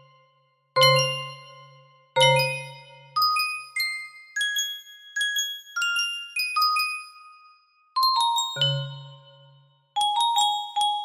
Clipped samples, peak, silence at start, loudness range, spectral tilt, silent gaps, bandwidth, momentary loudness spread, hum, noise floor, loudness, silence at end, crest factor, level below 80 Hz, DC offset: under 0.1%; -6 dBFS; 0.75 s; 3 LU; -2 dB/octave; none; 16 kHz; 15 LU; none; -66 dBFS; -23 LUFS; 0 s; 20 dB; -78 dBFS; under 0.1%